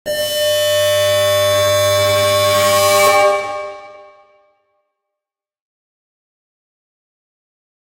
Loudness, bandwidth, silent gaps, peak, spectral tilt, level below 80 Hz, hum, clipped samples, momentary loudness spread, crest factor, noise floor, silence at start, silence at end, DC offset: -13 LUFS; 16 kHz; none; 0 dBFS; -2 dB/octave; -56 dBFS; none; under 0.1%; 8 LU; 16 dB; -85 dBFS; 0.05 s; 3.8 s; under 0.1%